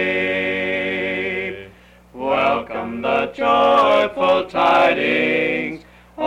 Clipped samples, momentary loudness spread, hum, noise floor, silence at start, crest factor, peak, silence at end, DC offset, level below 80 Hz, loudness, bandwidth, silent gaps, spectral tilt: under 0.1%; 12 LU; 60 Hz at -50 dBFS; -46 dBFS; 0 s; 14 dB; -6 dBFS; 0 s; under 0.1%; -52 dBFS; -18 LUFS; 10.5 kHz; none; -5.5 dB/octave